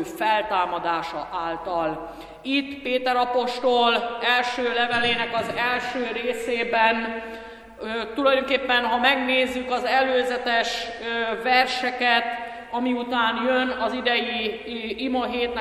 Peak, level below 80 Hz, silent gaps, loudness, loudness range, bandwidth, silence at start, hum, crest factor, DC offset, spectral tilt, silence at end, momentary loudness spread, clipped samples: -4 dBFS; -56 dBFS; none; -23 LUFS; 3 LU; 14 kHz; 0 s; none; 20 dB; under 0.1%; -3.5 dB/octave; 0 s; 10 LU; under 0.1%